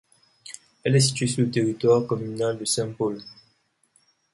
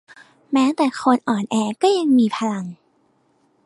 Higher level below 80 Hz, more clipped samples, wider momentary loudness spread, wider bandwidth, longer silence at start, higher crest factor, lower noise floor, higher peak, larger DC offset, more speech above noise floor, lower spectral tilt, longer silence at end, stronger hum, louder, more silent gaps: first, -62 dBFS vs -70 dBFS; neither; first, 21 LU vs 8 LU; about the same, 11.5 kHz vs 11.5 kHz; about the same, 0.45 s vs 0.5 s; about the same, 18 dB vs 18 dB; first, -67 dBFS vs -62 dBFS; second, -8 dBFS vs -4 dBFS; neither; about the same, 44 dB vs 44 dB; about the same, -5 dB/octave vs -5.5 dB/octave; about the same, 1 s vs 0.9 s; neither; second, -23 LUFS vs -19 LUFS; neither